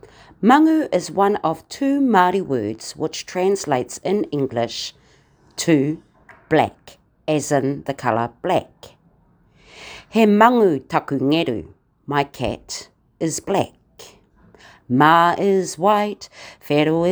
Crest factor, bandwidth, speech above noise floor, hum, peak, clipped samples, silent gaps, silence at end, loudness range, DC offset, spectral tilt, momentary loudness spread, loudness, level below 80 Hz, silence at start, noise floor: 20 dB; over 20 kHz; 38 dB; none; 0 dBFS; under 0.1%; none; 0 s; 5 LU; under 0.1%; -5 dB/octave; 16 LU; -19 LUFS; -54 dBFS; 0.4 s; -56 dBFS